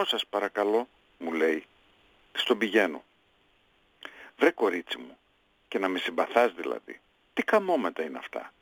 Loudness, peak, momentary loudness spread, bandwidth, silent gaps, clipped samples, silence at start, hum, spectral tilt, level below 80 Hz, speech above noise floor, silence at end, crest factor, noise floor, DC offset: -28 LUFS; -6 dBFS; 20 LU; 19 kHz; none; under 0.1%; 0 s; none; -4 dB/octave; -76 dBFS; 40 dB; 0.15 s; 24 dB; -67 dBFS; under 0.1%